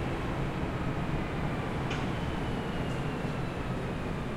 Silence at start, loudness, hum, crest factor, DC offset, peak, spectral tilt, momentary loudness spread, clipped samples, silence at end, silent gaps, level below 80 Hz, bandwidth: 0 s; -34 LUFS; none; 14 dB; under 0.1%; -18 dBFS; -7 dB/octave; 2 LU; under 0.1%; 0 s; none; -42 dBFS; 15.5 kHz